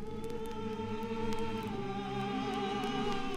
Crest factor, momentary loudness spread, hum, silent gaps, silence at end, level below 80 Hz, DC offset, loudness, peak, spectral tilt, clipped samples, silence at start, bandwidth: 16 dB; 5 LU; none; none; 0 s; -50 dBFS; under 0.1%; -37 LUFS; -20 dBFS; -6 dB/octave; under 0.1%; 0 s; 14.5 kHz